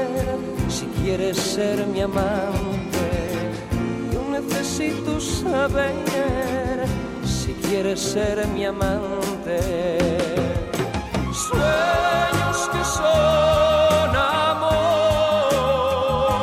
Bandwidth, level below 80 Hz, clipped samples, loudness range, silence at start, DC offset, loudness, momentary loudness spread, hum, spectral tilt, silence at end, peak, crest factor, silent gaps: 16 kHz; -36 dBFS; under 0.1%; 5 LU; 0 s; under 0.1%; -21 LUFS; 8 LU; none; -5 dB/octave; 0 s; -8 dBFS; 12 dB; none